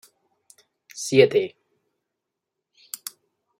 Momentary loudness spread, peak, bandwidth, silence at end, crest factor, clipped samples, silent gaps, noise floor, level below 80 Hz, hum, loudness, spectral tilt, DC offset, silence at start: 21 LU; -2 dBFS; 16 kHz; 2.1 s; 24 dB; under 0.1%; none; -83 dBFS; -70 dBFS; none; -21 LUFS; -4.5 dB/octave; under 0.1%; 0.95 s